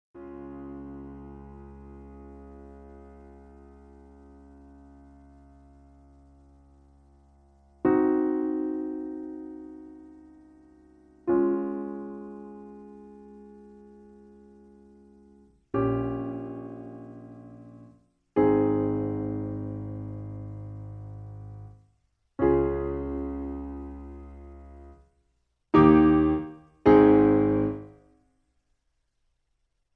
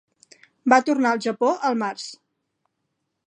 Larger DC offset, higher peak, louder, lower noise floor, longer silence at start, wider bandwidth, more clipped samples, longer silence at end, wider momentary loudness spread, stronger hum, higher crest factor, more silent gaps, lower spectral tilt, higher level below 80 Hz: neither; second, -6 dBFS vs -2 dBFS; second, -25 LUFS vs -21 LUFS; about the same, -75 dBFS vs -77 dBFS; second, 0.15 s vs 0.65 s; second, 4.4 kHz vs 10 kHz; neither; first, 2.05 s vs 1.15 s; first, 27 LU vs 13 LU; neither; about the same, 24 dB vs 22 dB; neither; first, -10.5 dB/octave vs -4 dB/octave; first, -48 dBFS vs -78 dBFS